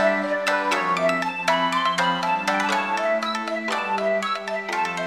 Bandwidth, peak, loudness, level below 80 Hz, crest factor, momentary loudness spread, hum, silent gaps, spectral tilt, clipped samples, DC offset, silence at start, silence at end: 16 kHz; -6 dBFS; -22 LUFS; -76 dBFS; 16 dB; 4 LU; none; none; -3.5 dB/octave; under 0.1%; under 0.1%; 0 s; 0 s